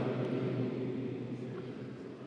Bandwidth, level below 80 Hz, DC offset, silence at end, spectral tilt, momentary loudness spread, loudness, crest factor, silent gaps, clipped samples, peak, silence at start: 7.8 kHz; -76 dBFS; under 0.1%; 0 s; -9 dB/octave; 9 LU; -38 LUFS; 14 dB; none; under 0.1%; -22 dBFS; 0 s